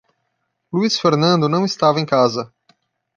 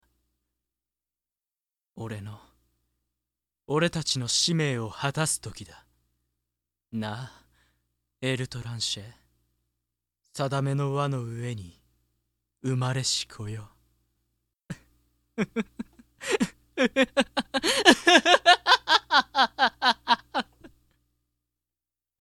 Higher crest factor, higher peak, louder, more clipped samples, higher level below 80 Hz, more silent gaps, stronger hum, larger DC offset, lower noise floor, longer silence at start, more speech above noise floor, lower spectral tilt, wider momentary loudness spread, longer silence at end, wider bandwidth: second, 16 dB vs 26 dB; about the same, -2 dBFS vs -4 dBFS; first, -17 LUFS vs -24 LUFS; neither; about the same, -62 dBFS vs -62 dBFS; neither; second, none vs 60 Hz at -60 dBFS; neither; second, -72 dBFS vs under -90 dBFS; second, 0.75 s vs 1.95 s; second, 56 dB vs over 64 dB; first, -5.5 dB/octave vs -3.5 dB/octave; second, 10 LU vs 23 LU; second, 0.7 s vs 1.55 s; second, 7.6 kHz vs 16 kHz